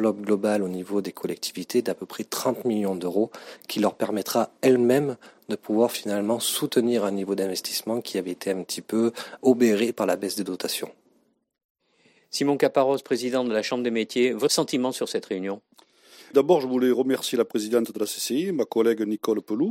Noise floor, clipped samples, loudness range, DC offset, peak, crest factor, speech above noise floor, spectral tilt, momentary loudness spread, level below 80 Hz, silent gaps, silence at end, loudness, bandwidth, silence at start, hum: -66 dBFS; under 0.1%; 3 LU; under 0.1%; -6 dBFS; 18 dB; 42 dB; -4.5 dB/octave; 9 LU; -76 dBFS; 11.64-11.75 s; 0 s; -25 LUFS; 16.5 kHz; 0 s; none